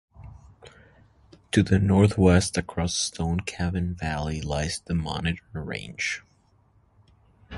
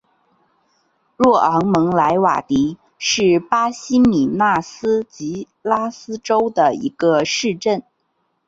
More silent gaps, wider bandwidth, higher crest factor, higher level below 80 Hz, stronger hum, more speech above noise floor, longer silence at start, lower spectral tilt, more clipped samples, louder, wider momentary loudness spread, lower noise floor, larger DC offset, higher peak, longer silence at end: neither; first, 11.5 kHz vs 7.8 kHz; first, 22 dB vs 16 dB; first, -38 dBFS vs -52 dBFS; neither; second, 37 dB vs 51 dB; second, 0.15 s vs 1.2 s; about the same, -5.5 dB/octave vs -5 dB/octave; neither; second, -25 LUFS vs -17 LUFS; about the same, 11 LU vs 9 LU; second, -62 dBFS vs -68 dBFS; neither; about the same, -4 dBFS vs -2 dBFS; second, 0 s vs 0.65 s